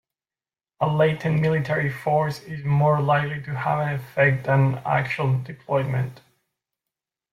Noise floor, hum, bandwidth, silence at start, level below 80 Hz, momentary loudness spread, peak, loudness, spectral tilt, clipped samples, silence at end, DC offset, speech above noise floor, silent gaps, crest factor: under -90 dBFS; none; 13.5 kHz; 0.8 s; -58 dBFS; 7 LU; -6 dBFS; -23 LUFS; -8 dB/octave; under 0.1%; 1.15 s; under 0.1%; over 68 dB; none; 16 dB